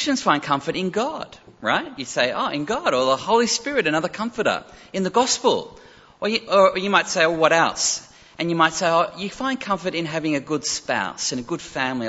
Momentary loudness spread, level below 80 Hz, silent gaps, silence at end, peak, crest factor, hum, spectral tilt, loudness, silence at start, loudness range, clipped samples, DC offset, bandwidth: 10 LU; -58 dBFS; none; 0 s; -2 dBFS; 20 dB; none; -3 dB/octave; -21 LUFS; 0 s; 3 LU; under 0.1%; under 0.1%; 8.2 kHz